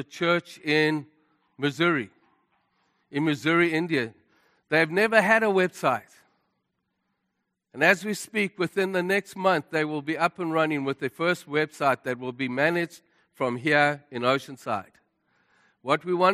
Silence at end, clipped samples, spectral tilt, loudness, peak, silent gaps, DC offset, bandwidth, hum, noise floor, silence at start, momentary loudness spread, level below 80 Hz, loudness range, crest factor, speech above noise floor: 0 s; under 0.1%; -5 dB/octave; -25 LUFS; -4 dBFS; none; under 0.1%; 14.5 kHz; none; -79 dBFS; 0 s; 10 LU; -74 dBFS; 4 LU; 22 dB; 54 dB